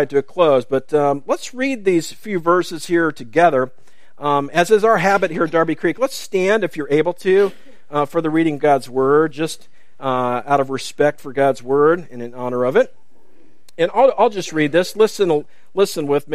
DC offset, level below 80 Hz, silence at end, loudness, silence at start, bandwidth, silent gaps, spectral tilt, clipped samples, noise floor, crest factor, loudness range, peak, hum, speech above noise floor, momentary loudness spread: 2%; -64 dBFS; 0 s; -18 LUFS; 0 s; 15.5 kHz; none; -5.5 dB/octave; under 0.1%; -55 dBFS; 16 dB; 2 LU; 0 dBFS; none; 38 dB; 8 LU